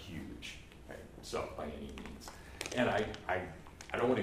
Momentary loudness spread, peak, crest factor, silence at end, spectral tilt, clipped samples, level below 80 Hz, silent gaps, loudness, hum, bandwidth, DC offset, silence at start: 17 LU; -18 dBFS; 20 dB; 0 s; -5 dB/octave; under 0.1%; -56 dBFS; none; -39 LUFS; none; 15.5 kHz; under 0.1%; 0 s